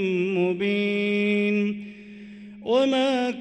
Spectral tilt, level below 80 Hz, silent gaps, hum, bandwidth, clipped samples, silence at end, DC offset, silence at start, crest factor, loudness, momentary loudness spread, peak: -6.5 dB/octave; -68 dBFS; none; none; 9.2 kHz; under 0.1%; 0 s; under 0.1%; 0 s; 12 dB; -23 LUFS; 21 LU; -12 dBFS